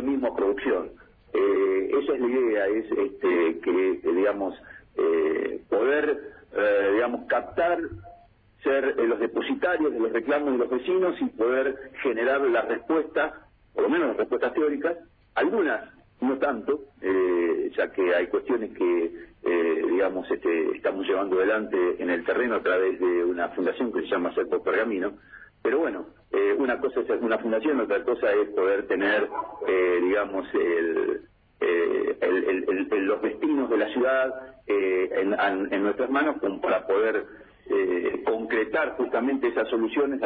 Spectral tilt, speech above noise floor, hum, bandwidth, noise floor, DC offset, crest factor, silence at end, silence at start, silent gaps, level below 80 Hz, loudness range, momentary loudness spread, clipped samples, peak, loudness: -9 dB/octave; 30 dB; none; 4.6 kHz; -55 dBFS; under 0.1%; 12 dB; 0 s; 0 s; none; -60 dBFS; 2 LU; 6 LU; under 0.1%; -12 dBFS; -25 LUFS